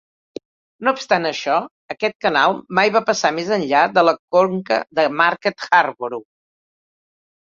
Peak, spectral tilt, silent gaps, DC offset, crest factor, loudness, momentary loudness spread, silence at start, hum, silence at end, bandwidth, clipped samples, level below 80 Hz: 0 dBFS; -4 dB/octave; 1.71-1.89 s, 2.15-2.20 s, 4.19-4.28 s; under 0.1%; 18 dB; -18 LUFS; 12 LU; 0.8 s; none; 1.25 s; 7.6 kHz; under 0.1%; -66 dBFS